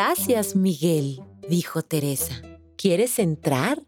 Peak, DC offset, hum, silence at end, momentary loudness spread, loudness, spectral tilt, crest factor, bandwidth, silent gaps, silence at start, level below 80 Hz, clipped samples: -6 dBFS; under 0.1%; none; 0.05 s; 10 LU; -23 LUFS; -5 dB/octave; 16 dB; over 20 kHz; none; 0 s; -58 dBFS; under 0.1%